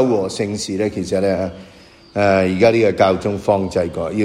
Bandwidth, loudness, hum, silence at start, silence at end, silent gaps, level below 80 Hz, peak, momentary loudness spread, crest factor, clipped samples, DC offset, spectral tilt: 12.5 kHz; -18 LUFS; none; 0 s; 0 s; none; -48 dBFS; 0 dBFS; 8 LU; 16 dB; under 0.1%; under 0.1%; -6 dB/octave